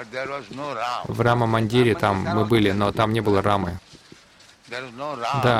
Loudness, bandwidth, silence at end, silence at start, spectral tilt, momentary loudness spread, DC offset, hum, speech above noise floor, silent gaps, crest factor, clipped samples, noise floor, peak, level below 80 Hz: -22 LUFS; 15.5 kHz; 0 s; 0 s; -6.5 dB/octave; 12 LU; under 0.1%; none; 30 dB; none; 16 dB; under 0.1%; -51 dBFS; -6 dBFS; -50 dBFS